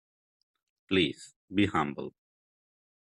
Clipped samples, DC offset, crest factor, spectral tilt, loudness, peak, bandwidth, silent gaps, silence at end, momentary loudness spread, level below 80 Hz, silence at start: under 0.1%; under 0.1%; 20 dB; -5.5 dB/octave; -30 LUFS; -12 dBFS; 11 kHz; 1.36-1.48 s; 0.95 s; 16 LU; -66 dBFS; 0.9 s